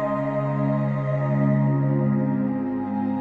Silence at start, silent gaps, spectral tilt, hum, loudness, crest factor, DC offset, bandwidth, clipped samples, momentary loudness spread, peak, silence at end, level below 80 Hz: 0 s; none; -11.5 dB/octave; none; -23 LUFS; 12 dB; 0.1%; 3.9 kHz; under 0.1%; 5 LU; -10 dBFS; 0 s; -56 dBFS